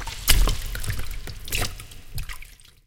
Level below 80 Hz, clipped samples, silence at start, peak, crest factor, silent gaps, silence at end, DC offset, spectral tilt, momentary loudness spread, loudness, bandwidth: -28 dBFS; under 0.1%; 0 s; 0 dBFS; 24 dB; none; 0.35 s; under 0.1%; -2.5 dB/octave; 19 LU; -27 LUFS; 17 kHz